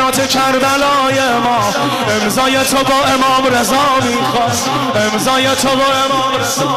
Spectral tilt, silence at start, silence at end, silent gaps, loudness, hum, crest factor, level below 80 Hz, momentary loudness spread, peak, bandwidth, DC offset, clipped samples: -3 dB/octave; 0 s; 0 s; none; -12 LUFS; none; 8 dB; -42 dBFS; 3 LU; -4 dBFS; 15.5 kHz; under 0.1%; under 0.1%